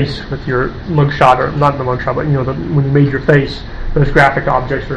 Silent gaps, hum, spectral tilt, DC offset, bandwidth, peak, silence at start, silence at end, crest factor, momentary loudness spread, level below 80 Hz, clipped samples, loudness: none; none; -8 dB/octave; under 0.1%; 8.4 kHz; 0 dBFS; 0 s; 0 s; 14 dB; 8 LU; -26 dBFS; 0.3%; -13 LUFS